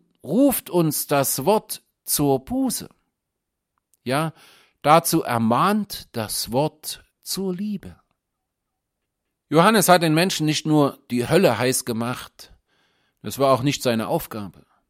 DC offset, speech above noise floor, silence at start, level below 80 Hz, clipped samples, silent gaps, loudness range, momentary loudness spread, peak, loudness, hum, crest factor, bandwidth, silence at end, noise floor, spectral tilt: under 0.1%; 60 dB; 0.25 s; -56 dBFS; under 0.1%; none; 7 LU; 16 LU; -2 dBFS; -21 LUFS; none; 22 dB; 16.5 kHz; 0.4 s; -81 dBFS; -4.5 dB/octave